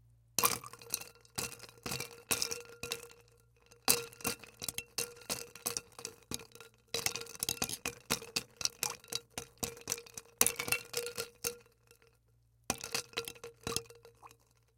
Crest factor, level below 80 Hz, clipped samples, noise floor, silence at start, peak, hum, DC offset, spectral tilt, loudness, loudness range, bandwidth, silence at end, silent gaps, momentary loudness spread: 36 dB; -66 dBFS; under 0.1%; -70 dBFS; 0.4 s; -4 dBFS; none; under 0.1%; -1 dB/octave; -37 LUFS; 4 LU; 17 kHz; 0.5 s; none; 14 LU